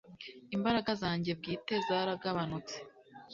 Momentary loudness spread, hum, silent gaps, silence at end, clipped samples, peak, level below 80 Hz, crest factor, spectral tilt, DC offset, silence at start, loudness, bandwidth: 15 LU; none; none; 0 s; under 0.1%; -18 dBFS; -64 dBFS; 18 dB; -4 dB/octave; under 0.1%; 0.05 s; -35 LUFS; 7.6 kHz